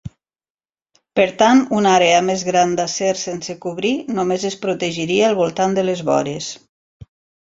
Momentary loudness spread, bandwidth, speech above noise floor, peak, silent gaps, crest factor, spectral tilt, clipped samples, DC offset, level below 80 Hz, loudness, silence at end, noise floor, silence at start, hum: 13 LU; 7.8 kHz; over 73 dB; -2 dBFS; 0.50-0.55 s; 16 dB; -4 dB/octave; under 0.1%; under 0.1%; -56 dBFS; -17 LUFS; 0.85 s; under -90 dBFS; 0.05 s; none